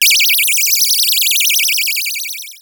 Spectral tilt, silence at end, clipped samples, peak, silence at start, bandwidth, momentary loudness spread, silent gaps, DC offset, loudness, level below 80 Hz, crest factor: 7.5 dB/octave; 0.05 s; under 0.1%; 0 dBFS; 0 s; over 20 kHz; 9 LU; none; under 0.1%; -10 LUFS; -62 dBFS; 14 dB